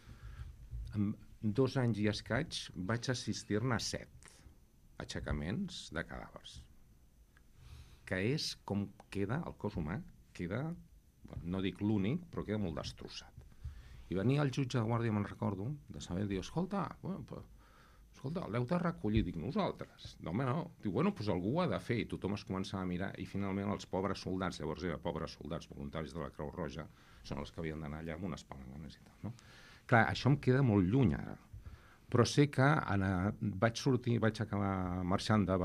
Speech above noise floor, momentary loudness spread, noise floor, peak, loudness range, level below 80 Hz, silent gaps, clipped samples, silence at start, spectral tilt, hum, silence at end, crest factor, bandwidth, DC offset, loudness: 28 dB; 19 LU; -64 dBFS; -12 dBFS; 10 LU; -56 dBFS; none; under 0.1%; 0.05 s; -6.5 dB/octave; none; 0 s; 24 dB; 14 kHz; under 0.1%; -37 LUFS